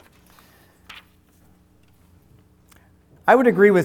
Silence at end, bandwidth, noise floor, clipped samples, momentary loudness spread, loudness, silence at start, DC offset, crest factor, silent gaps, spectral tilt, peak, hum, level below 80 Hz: 0 s; 14.5 kHz; -56 dBFS; under 0.1%; 29 LU; -16 LUFS; 3.25 s; under 0.1%; 20 dB; none; -7 dB/octave; -2 dBFS; none; -60 dBFS